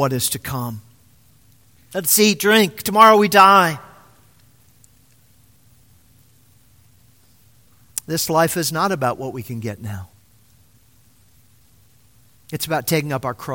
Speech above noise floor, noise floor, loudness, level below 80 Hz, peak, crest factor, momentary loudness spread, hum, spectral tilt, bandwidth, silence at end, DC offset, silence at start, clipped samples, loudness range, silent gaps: 38 dB; -55 dBFS; -17 LUFS; -56 dBFS; 0 dBFS; 20 dB; 20 LU; none; -3.5 dB/octave; 17 kHz; 0 s; 0.1%; 0 s; under 0.1%; 18 LU; none